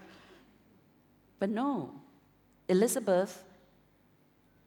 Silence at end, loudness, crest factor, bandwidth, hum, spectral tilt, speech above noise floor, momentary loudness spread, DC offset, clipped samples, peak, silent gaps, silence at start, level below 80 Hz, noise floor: 1.25 s; -31 LUFS; 20 dB; 19 kHz; none; -5.5 dB/octave; 36 dB; 23 LU; under 0.1%; under 0.1%; -14 dBFS; none; 1.4 s; -76 dBFS; -66 dBFS